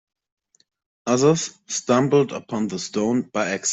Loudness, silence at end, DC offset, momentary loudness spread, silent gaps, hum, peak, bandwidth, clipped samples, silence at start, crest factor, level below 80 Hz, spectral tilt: -22 LUFS; 0 s; under 0.1%; 9 LU; none; none; -6 dBFS; 8.4 kHz; under 0.1%; 1.05 s; 18 dB; -64 dBFS; -4.5 dB/octave